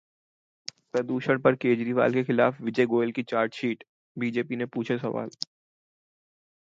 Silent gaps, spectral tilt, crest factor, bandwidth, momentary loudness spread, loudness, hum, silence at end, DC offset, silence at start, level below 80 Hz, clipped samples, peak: 3.89-4.15 s; -6.5 dB/octave; 22 dB; 7.6 kHz; 14 LU; -27 LUFS; none; 1.35 s; under 0.1%; 0.95 s; -72 dBFS; under 0.1%; -6 dBFS